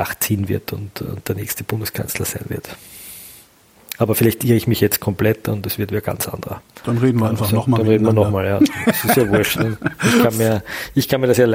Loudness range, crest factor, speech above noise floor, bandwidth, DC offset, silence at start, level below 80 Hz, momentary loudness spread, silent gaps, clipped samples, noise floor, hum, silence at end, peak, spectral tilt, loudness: 8 LU; 16 dB; 31 dB; 16.5 kHz; under 0.1%; 0 s; -46 dBFS; 14 LU; none; under 0.1%; -49 dBFS; none; 0 s; -2 dBFS; -5.5 dB/octave; -18 LUFS